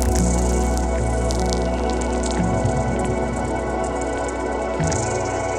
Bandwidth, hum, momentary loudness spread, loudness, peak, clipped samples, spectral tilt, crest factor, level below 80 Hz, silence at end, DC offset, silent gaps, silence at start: 13.5 kHz; none; 4 LU; -22 LUFS; 0 dBFS; under 0.1%; -5.5 dB/octave; 20 dB; -26 dBFS; 0 s; under 0.1%; none; 0 s